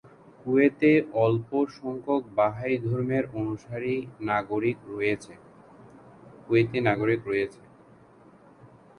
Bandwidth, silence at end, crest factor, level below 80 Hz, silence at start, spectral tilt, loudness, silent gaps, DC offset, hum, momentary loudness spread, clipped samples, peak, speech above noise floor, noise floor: 10.5 kHz; 0.35 s; 20 dB; -62 dBFS; 0.45 s; -8 dB/octave; -26 LUFS; none; under 0.1%; none; 11 LU; under 0.1%; -8 dBFS; 28 dB; -54 dBFS